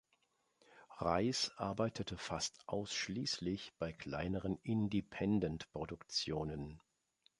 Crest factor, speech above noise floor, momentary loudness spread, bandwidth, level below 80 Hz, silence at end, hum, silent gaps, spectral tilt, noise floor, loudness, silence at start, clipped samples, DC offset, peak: 22 dB; 40 dB; 9 LU; 11.5 kHz; -60 dBFS; 0.6 s; none; none; -4.5 dB/octave; -79 dBFS; -40 LUFS; 0.7 s; under 0.1%; under 0.1%; -18 dBFS